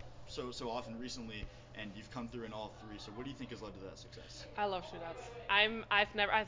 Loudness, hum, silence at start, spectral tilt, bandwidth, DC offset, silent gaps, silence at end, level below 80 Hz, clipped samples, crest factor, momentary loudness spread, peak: -38 LUFS; none; 0 s; -4 dB/octave; 7.6 kHz; under 0.1%; none; 0 s; -58 dBFS; under 0.1%; 24 dB; 19 LU; -16 dBFS